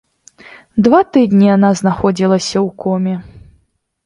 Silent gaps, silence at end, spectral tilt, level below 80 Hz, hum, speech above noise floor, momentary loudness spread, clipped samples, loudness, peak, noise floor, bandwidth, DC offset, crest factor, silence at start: none; 0.65 s; -6.5 dB/octave; -46 dBFS; none; 48 dB; 9 LU; under 0.1%; -13 LUFS; 0 dBFS; -60 dBFS; 11.5 kHz; under 0.1%; 14 dB; 0.75 s